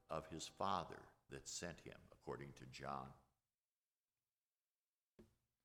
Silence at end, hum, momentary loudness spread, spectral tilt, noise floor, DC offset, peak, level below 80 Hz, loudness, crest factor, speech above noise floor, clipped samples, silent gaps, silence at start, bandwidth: 0.4 s; none; 15 LU; -3.5 dB/octave; under -90 dBFS; under 0.1%; -28 dBFS; -74 dBFS; -50 LUFS; 26 dB; over 40 dB; under 0.1%; 3.78-4.06 s, 4.33-4.96 s, 5.04-5.17 s; 0.1 s; 17.5 kHz